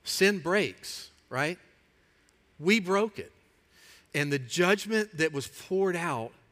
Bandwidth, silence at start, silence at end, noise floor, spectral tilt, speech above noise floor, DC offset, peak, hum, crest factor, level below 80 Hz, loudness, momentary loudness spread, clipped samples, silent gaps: 16 kHz; 0.05 s; 0.2 s; -65 dBFS; -4 dB/octave; 37 dB; under 0.1%; -10 dBFS; none; 20 dB; -70 dBFS; -29 LUFS; 15 LU; under 0.1%; none